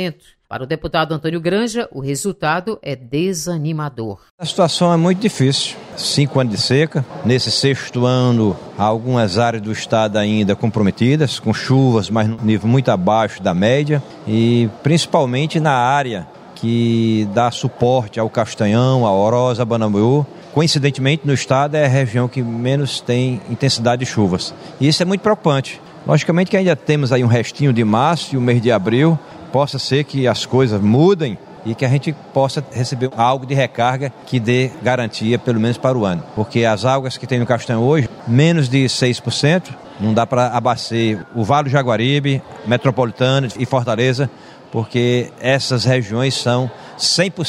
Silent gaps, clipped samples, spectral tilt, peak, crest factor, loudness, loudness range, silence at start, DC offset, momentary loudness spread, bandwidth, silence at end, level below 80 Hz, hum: 4.31-4.38 s; under 0.1%; -6 dB/octave; 0 dBFS; 16 dB; -17 LUFS; 2 LU; 0 s; under 0.1%; 7 LU; 12.5 kHz; 0 s; -52 dBFS; none